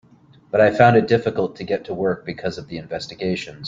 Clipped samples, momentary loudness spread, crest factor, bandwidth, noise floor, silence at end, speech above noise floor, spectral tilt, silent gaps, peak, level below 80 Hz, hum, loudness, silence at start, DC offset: under 0.1%; 15 LU; 18 dB; 7.6 kHz; -51 dBFS; 0 s; 32 dB; -7 dB/octave; none; -2 dBFS; -54 dBFS; none; -20 LUFS; 0.55 s; under 0.1%